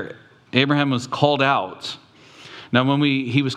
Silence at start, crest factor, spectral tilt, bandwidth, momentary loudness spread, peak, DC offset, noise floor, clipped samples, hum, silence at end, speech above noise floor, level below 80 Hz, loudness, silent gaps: 0 s; 22 dB; -6 dB/octave; 9.8 kHz; 18 LU; 0 dBFS; under 0.1%; -45 dBFS; under 0.1%; none; 0 s; 26 dB; -70 dBFS; -20 LUFS; none